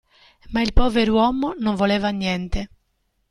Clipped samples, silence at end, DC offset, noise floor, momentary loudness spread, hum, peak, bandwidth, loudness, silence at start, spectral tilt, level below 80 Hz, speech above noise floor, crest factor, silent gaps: under 0.1%; 0.65 s; under 0.1%; -69 dBFS; 11 LU; none; -2 dBFS; 11 kHz; -21 LUFS; 0.5 s; -6 dB/octave; -30 dBFS; 50 dB; 18 dB; none